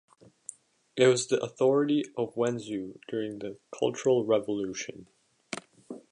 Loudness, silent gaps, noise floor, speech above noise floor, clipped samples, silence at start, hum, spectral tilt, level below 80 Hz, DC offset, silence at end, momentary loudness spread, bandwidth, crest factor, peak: -28 LUFS; none; -50 dBFS; 22 dB; under 0.1%; 0.95 s; none; -4.5 dB/octave; -74 dBFS; under 0.1%; 0.15 s; 20 LU; 11 kHz; 20 dB; -10 dBFS